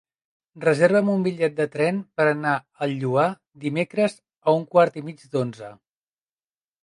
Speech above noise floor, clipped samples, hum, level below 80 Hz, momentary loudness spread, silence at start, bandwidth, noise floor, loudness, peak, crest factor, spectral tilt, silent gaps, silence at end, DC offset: over 68 dB; under 0.1%; none; -72 dBFS; 11 LU; 0.55 s; 11 kHz; under -90 dBFS; -23 LUFS; -4 dBFS; 20 dB; -7 dB/octave; none; 1.1 s; under 0.1%